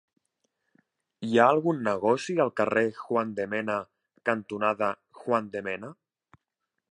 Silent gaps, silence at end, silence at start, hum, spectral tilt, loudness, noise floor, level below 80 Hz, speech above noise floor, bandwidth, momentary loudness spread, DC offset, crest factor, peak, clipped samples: none; 1 s; 1.2 s; none; -6 dB/octave; -27 LUFS; -84 dBFS; -72 dBFS; 58 dB; 10.5 kHz; 13 LU; under 0.1%; 22 dB; -6 dBFS; under 0.1%